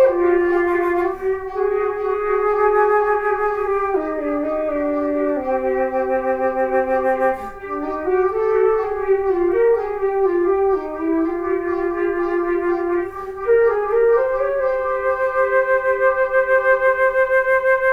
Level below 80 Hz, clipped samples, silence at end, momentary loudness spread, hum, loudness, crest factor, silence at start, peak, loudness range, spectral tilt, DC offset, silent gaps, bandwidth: -44 dBFS; under 0.1%; 0 s; 6 LU; none; -19 LUFS; 14 dB; 0 s; -4 dBFS; 3 LU; -7 dB/octave; under 0.1%; none; 5.4 kHz